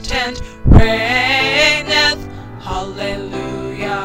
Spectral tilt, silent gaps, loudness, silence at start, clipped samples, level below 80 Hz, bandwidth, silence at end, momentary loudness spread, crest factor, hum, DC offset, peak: -4.5 dB/octave; none; -15 LUFS; 0 s; 0.3%; -22 dBFS; 16 kHz; 0 s; 13 LU; 14 dB; none; under 0.1%; 0 dBFS